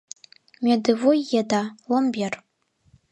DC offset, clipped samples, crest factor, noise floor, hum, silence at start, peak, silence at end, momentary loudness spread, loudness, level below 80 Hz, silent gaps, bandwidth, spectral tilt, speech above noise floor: under 0.1%; under 0.1%; 18 dB; -60 dBFS; none; 0.6 s; -6 dBFS; 0.75 s; 15 LU; -22 LUFS; -70 dBFS; none; 11 kHz; -5 dB/octave; 39 dB